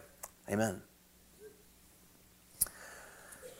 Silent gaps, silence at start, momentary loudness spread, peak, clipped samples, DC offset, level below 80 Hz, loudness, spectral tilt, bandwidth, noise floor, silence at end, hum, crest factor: none; 0 s; 26 LU; -12 dBFS; under 0.1%; under 0.1%; -66 dBFS; -38 LUFS; -4 dB/octave; 16.5 kHz; -63 dBFS; 0 s; none; 30 dB